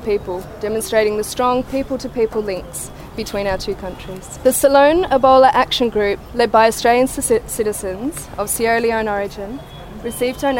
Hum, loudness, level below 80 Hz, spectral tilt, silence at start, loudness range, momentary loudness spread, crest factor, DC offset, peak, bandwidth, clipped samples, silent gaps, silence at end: none; -17 LUFS; -38 dBFS; -3.5 dB/octave; 0 s; 7 LU; 16 LU; 18 dB; under 0.1%; 0 dBFS; 16.5 kHz; under 0.1%; none; 0 s